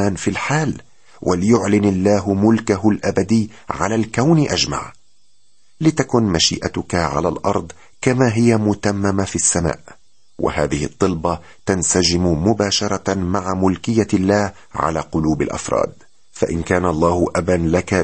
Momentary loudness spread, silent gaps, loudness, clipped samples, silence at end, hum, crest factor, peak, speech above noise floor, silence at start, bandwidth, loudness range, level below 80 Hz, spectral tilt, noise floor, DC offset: 8 LU; none; -18 LUFS; under 0.1%; 0 s; none; 16 dB; -2 dBFS; 44 dB; 0 s; 8.8 kHz; 2 LU; -40 dBFS; -5 dB/octave; -62 dBFS; 0.6%